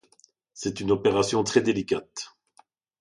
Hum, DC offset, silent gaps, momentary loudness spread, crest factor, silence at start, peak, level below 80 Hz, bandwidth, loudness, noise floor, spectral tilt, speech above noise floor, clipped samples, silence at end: none; under 0.1%; none; 16 LU; 20 dB; 0.55 s; -6 dBFS; -58 dBFS; 11.5 kHz; -25 LUFS; -62 dBFS; -4.5 dB/octave; 37 dB; under 0.1%; 0.7 s